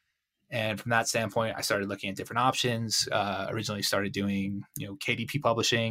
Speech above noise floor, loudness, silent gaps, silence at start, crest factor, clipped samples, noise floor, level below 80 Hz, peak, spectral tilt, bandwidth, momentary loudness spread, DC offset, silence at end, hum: 49 dB; -29 LUFS; none; 0.5 s; 20 dB; under 0.1%; -78 dBFS; -66 dBFS; -10 dBFS; -3.5 dB/octave; 16 kHz; 8 LU; under 0.1%; 0 s; none